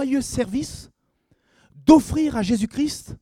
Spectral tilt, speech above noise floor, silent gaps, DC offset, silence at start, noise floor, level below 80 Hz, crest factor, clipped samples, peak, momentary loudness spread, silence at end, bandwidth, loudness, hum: -5.5 dB/octave; 46 dB; none; under 0.1%; 0 s; -66 dBFS; -44 dBFS; 22 dB; under 0.1%; 0 dBFS; 13 LU; 0.05 s; 15 kHz; -21 LUFS; none